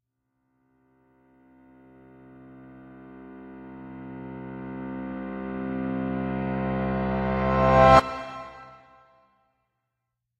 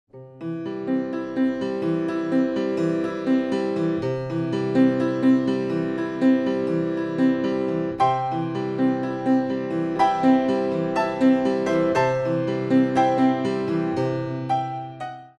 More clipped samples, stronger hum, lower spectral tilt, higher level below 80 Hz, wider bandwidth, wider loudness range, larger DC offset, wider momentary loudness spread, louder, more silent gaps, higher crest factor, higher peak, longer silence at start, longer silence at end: neither; neither; about the same, -7.5 dB/octave vs -7.5 dB/octave; first, -44 dBFS vs -58 dBFS; about the same, 9.6 kHz vs 9 kHz; first, 20 LU vs 3 LU; neither; first, 27 LU vs 7 LU; about the same, -24 LUFS vs -23 LUFS; neither; first, 24 dB vs 14 dB; first, -4 dBFS vs -8 dBFS; first, 2.3 s vs 0.15 s; first, 1.65 s vs 0.1 s